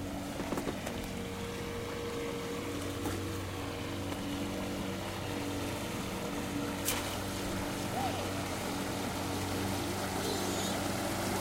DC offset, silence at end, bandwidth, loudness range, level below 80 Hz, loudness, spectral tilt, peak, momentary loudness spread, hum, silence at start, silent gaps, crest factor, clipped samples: under 0.1%; 0 s; 16 kHz; 3 LU; -52 dBFS; -36 LUFS; -4 dB/octave; -16 dBFS; 5 LU; none; 0 s; none; 20 dB; under 0.1%